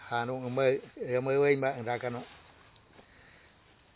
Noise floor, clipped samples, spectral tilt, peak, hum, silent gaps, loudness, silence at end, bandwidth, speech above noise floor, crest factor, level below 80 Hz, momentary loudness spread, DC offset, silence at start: -61 dBFS; under 0.1%; -5.5 dB/octave; -12 dBFS; none; none; -30 LUFS; 0.95 s; 4 kHz; 31 dB; 20 dB; -68 dBFS; 11 LU; under 0.1%; 0 s